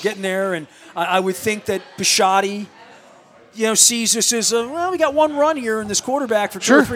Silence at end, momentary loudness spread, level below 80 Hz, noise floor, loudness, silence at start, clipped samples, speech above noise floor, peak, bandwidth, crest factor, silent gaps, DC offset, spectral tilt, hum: 0 s; 12 LU; -58 dBFS; -47 dBFS; -17 LUFS; 0 s; under 0.1%; 29 dB; 0 dBFS; 17.5 kHz; 18 dB; none; under 0.1%; -2 dB/octave; none